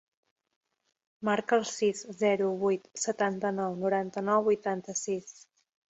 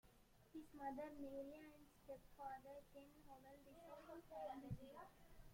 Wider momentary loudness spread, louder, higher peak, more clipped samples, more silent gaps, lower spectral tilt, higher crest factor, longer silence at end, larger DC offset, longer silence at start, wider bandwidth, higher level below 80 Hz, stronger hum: second, 7 LU vs 12 LU; first, -30 LUFS vs -58 LUFS; first, -12 dBFS vs -38 dBFS; neither; neither; second, -4.5 dB/octave vs -6.5 dB/octave; about the same, 18 dB vs 18 dB; first, 0.6 s vs 0 s; neither; first, 1.2 s vs 0.05 s; second, 8.4 kHz vs 16.5 kHz; about the same, -76 dBFS vs -72 dBFS; neither